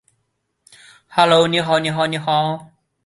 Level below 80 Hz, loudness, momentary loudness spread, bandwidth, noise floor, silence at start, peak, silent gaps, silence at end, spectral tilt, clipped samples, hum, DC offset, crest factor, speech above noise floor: -60 dBFS; -17 LUFS; 10 LU; 11.5 kHz; -71 dBFS; 1.1 s; -2 dBFS; none; 0.4 s; -5 dB/octave; under 0.1%; none; under 0.1%; 18 dB; 55 dB